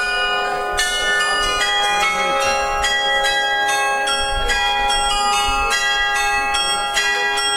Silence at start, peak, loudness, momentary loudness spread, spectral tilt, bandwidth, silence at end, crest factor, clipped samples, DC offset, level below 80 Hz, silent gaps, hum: 0 s; -4 dBFS; -17 LUFS; 2 LU; 0 dB/octave; 16 kHz; 0 s; 14 dB; under 0.1%; under 0.1%; -34 dBFS; none; none